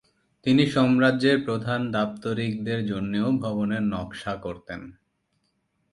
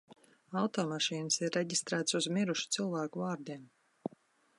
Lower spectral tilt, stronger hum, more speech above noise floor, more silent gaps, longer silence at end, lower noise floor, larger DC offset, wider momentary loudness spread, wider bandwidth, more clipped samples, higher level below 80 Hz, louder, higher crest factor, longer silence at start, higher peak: first, -7 dB/octave vs -3.5 dB/octave; neither; first, 49 dB vs 32 dB; neither; first, 1 s vs 0.5 s; first, -73 dBFS vs -66 dBFS; neither; about the same, 13 LU vs 14 LU; about the same, 11.5 kHz vs 11.5 kHz; neither; first, -56 dBFS vs -84 dBFS; first, -25 LUFS vs -34 LUFS; about the same, 20 dB vs 20 dB; first, 0.45 s vs 0.1 s; first, -6 dBFS vs -16 dBFS